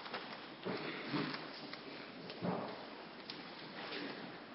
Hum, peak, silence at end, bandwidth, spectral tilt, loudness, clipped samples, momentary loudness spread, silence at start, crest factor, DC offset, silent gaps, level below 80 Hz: none; -26 dBFS; 0 s; 5.6 kHz; -3 dB/octave; -45 LUFS; under 0.1%; 8 LU; 0 s; 18 dB; under 0.1%; none; -80 dBFS